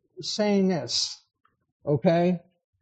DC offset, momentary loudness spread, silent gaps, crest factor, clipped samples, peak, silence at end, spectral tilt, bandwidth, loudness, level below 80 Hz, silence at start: under 0.1%; 11 LU; 1.72-1.80 s; 18 dB; under 0.1%; -8 dBFS; 0.45 s; -5 dB/octave; 8.8 kHz; -25 LUFS; -70 dBFS; 0.15 s